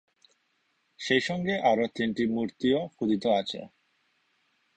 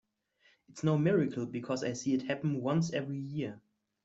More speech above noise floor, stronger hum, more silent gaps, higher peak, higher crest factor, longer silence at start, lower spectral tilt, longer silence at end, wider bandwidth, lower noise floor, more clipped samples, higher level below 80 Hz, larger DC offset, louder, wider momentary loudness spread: first, 46 dB vs 38 dB; neither; neither; first, -10 dBFS vs -16 dBFS; about the same, 20 dB vs 16 dB; first, 1 s vs 0.7 s; about the same, -5.5 dB/octave vs -6.5 dB/octave; first, 1.1 s vs 0.45 s; first, 9 kHz vs 8 kHz; about the same, -73 dBFS vs -70 dBFS; neither; first, -66 dBFS vs -72 dBFS; neither; first, -28 LUFS vs -33 LUFS; second, 6 LU vs 10 LU